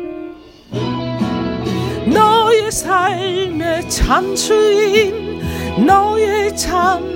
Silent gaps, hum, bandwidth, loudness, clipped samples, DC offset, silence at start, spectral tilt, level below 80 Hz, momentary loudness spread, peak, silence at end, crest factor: none; none; 16.5 kHz; -15 LUFS; under 0.1%; under 0.1%; 0 s; -4 dB/octave; -32 dBFS; 11 LU; 0 dBFS; 0 s; 16 dB